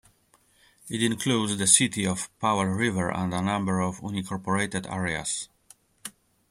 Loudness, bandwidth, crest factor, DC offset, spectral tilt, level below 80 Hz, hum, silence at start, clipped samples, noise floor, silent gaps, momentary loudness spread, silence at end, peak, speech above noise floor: -26 LUFS; 15.5 kHz; 24 dB; under 0.1%; -3.5 dB/octave; -60 dBFS; none; 0.85 s; under 0.1%; -64 dBFS; none; 16 LU; 0.4 s; -4 dBFS; 37 dB